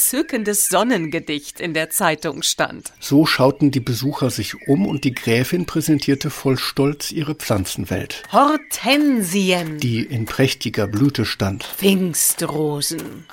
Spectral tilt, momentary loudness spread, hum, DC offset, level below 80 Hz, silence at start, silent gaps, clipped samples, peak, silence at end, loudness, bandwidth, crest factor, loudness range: -4 dB/octave; 8 LU; none; under 0.1%; -50 dBFS; 0 s; none; under 0.1%; 0 dBFS; 0 s; -19 LUFS; 17 kHz; 18 dB; 2 LU